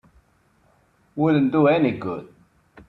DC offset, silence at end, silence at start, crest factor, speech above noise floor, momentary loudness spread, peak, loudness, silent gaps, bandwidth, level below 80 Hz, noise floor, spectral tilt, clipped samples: under 0.1%; 0.6 s; 1.15 s; 18 dB; 42 dB; 16 LU; -6 dBFS; -20 LUFS; none; 4.5 kHz; -60 dBFS; -62 dBFS; -9.5 dB/octave; under 0.1%